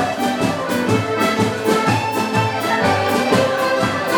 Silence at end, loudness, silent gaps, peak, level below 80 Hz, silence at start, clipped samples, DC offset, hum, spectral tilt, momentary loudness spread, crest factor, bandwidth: 0 s; -18 LUFS; none; -2 dBFS; -52 dBFS; 0 s; under 0.1%; under 0.1%; none; -5 dB/octave; 3 LU; 14 dB; over 20 kHz